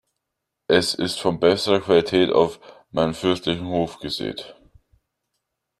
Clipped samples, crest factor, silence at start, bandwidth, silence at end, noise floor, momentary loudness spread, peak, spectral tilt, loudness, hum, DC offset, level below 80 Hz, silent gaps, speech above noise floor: under 0.1%; 20 dB; 0.7 s; 13 kHz; 1.3 s; -81 dBFS; 12 LU; -2 dBFS; -5 dB/octave; -21 LUFS; none; under 0.1%; -54 dBFS; none; 60 dB